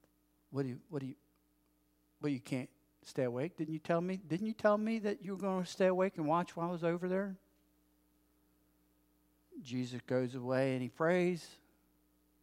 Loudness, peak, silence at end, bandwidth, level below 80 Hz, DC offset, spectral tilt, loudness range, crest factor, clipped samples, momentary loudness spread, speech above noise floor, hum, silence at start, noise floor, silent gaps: -37 LUFS; -16 dBFS; 0.9 s; 16 kHz; -80 dBFS; under 0.1%; -7 dB/octave; 8 LU; 22 dB; under 0.1%; 12 LU; 39 dB; none; 0.5 s; -75 dBFS; none